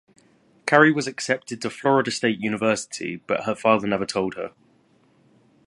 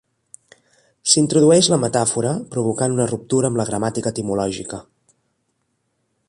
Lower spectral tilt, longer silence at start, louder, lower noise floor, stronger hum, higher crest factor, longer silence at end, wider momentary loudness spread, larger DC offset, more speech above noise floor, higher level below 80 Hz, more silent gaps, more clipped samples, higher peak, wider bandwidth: about the same, -4.5 dB/octave vs -4.5 dB/octave; second, 0.65 s vs 1.05 s; second, -22 LUFS vs -18 LUFS; second, -60 dBFS vs -70 dBFS; neither; about the same, 24 dB vs 20 dB; second, 1.2 s vs 1.45 s; about the same, 14 LU vs 12 LU; neither; second, 38 dB vs 52 dB; second, -64 dBFS vs -54 dBFS; neither; neither; about the same, 0 dBFS vs 0 dBFS; about the same, 11.5 kHz vs 11.5 kHz